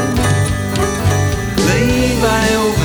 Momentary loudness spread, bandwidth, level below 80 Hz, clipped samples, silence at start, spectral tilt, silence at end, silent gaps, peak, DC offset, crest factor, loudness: 4 LU; over 20 kHz; -26 dBFS; under 0.1%; 0 s; -5 dB/octave; 0 s; none; 0 dBFS; under 0.1%; 14 dB; -14 LUFS